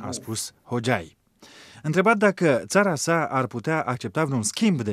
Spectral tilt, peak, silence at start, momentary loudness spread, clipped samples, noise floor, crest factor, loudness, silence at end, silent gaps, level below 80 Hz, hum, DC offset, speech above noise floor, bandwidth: -5 dB/octave; -6 dBFS; 0 s; 10 LU; under 0.1%; -50 dBFS; 18 dB; -23 LUFS; 0 s; none; -64 dBFS; none; under 0.1%; 27 dB; 15.5 kHz